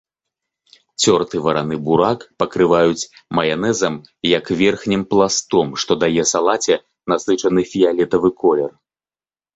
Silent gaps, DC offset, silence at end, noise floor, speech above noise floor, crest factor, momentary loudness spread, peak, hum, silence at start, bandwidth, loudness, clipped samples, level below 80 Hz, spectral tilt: none; under 0.1%; 0.85 s; under -90 dBFS; over 73 dB; 16 dB; 6 LU; -2 dBFS; none; 1 s; 8.2 kHz; -17 LUFS; under 0.1%; -52 dBFS; -4 dB/octave